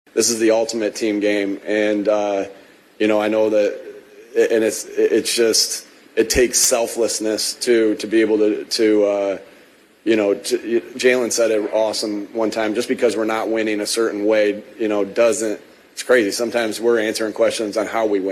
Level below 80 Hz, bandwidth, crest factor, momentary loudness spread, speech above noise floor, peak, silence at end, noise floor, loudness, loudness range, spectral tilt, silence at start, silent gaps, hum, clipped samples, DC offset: -50 dBFS; 13.5 kHz; 16 dB; 7 LU; 31 dB; -2 dBFS; 0 s; -49 dBFS; -18 LUFS; 3 LU; -2.5 dB/octave; 0.15 s; none; none; under 0.1%; under 0.1%